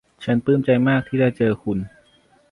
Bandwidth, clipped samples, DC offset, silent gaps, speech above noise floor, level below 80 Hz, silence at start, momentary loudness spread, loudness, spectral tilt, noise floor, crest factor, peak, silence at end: 10.5 kHz; under 0.1%; under 0.1%; none; 38 dB; -52 dBFS; 0.2 s; 9 LU; -20 LUFS; -9 dB/octave; -57 dBFS; 16 dB; -6 dBFS; 0.65 s